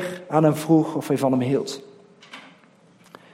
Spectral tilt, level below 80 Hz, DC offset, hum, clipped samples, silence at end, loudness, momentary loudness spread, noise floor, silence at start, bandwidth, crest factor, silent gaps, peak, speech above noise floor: -7 dB/octave; -66 dBFS; under 0.1%; none; under 0.1%; 0.85 s; -21 LUFS; 23 LU; -54 dBFS; 0 s; 16 kHz; 18 dB; none; -4 dBFS; 34 dB